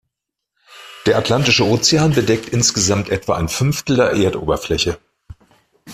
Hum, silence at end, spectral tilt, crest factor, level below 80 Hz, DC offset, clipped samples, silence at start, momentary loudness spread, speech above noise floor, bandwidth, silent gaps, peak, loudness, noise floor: none; 0 s; -4 dB/octave; 16 dB; -42 dBFS; under 0.1%; under 0.1%; 0.7 s; 7 LU; 63 dB; 15.5 kHz; none; -2 dBFS; -16 LUFS; -79 dBFS